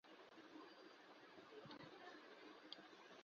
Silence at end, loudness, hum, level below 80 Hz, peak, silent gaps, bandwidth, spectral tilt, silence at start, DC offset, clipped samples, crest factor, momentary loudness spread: 0 s; -61 LUFS; none; under -90 dBFS; -36 dBFS; none; 7 kHz; -2 dB/octave; 0.05 s; under 0.1%; under 0.1%; 26 dB; 5 LU